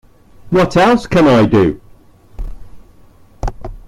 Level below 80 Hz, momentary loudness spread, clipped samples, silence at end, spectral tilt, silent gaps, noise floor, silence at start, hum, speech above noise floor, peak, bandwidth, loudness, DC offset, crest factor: -30 dBFS; 23 LU; under 0.1%; 0.05 s; -7 dB/octave; none; -43 dBFS; 0.45 s; none; 33 dB; -2 dBFS; 14.5 kHz; -12 LUFS; under 0.1%; 14 dB